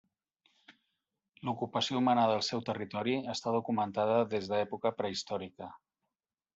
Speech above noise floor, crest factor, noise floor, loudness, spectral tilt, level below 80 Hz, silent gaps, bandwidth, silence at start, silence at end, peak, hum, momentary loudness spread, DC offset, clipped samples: over 58 dB; 18 dB; under -90 dBFS; -33 LUFS; -5 dB/octave; -76 dBFS; none; 8 kHz; 0.7 s; 0.8 s; -16 dBFS; none; 11 LU; under 0.1%; under 0.1%